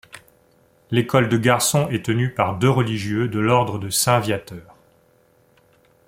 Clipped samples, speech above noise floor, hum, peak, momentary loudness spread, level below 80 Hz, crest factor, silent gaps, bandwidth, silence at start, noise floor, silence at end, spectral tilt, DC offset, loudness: under 0.1%; 38 dB; none; -2 dBFS; 7 LU; -54 dBFS; 20 dB; none; 16.5 kHz; 0.15 s; -58 dBFS; 1.45 s; -5 dB/octave; under 0.1%; -20 LUFS